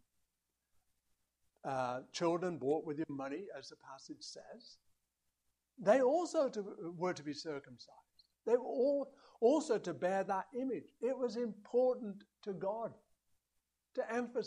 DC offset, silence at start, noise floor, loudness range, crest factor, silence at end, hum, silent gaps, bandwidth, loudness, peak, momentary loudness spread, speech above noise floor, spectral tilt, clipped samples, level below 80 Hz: under 0.1%; 1.65 s; -86 dBFS; 5 LU; 22 dB; 0 s; none; none; 10.5 kHz; -37 LUFS; -16 dBFS; 17 LU; 49 dB; -5.5 dB/octave; under 0.1%; -84 dBFS